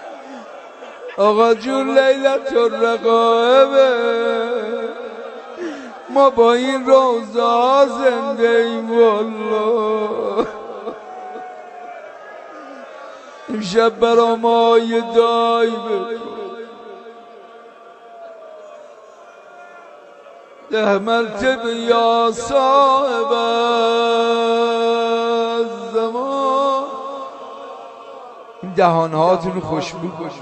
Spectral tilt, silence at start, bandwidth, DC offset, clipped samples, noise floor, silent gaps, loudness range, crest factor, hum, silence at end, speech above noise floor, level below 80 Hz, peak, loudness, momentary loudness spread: -5 dB/octave; 0 s; 8.6 kHz; under 0.1%; under 0.1%; -41 dBFS; none; 9 LU; 18 dB; none; 0 s; 26 dB; -58 dBFS; 0 dBFS; -16 LUFS; 22 LU